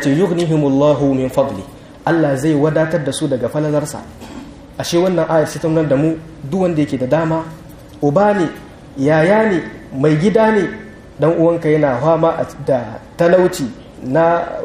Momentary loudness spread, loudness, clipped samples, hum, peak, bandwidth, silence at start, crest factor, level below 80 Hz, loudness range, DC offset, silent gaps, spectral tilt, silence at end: 17 LU; -15 LUFS; under 0.1%; none; 0 dBFS; 15.5 kHz; 0 s; 14 dB; -44 dBFS; 3 LU; under 0.1%; none; -6.5 dB/octave; 0 s